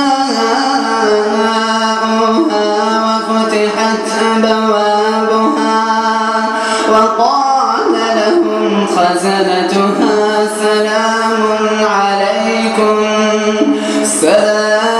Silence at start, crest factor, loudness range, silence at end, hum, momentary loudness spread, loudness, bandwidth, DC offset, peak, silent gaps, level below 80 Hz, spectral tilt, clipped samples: 0 s; 12 dB; 1 LU; 0 s; none; 2 LU; -12 LUFS; 13 kHz; under 0.1%; 0 dBFS; none; -56 dBFS; -3.5 dB/octave; under 0.1%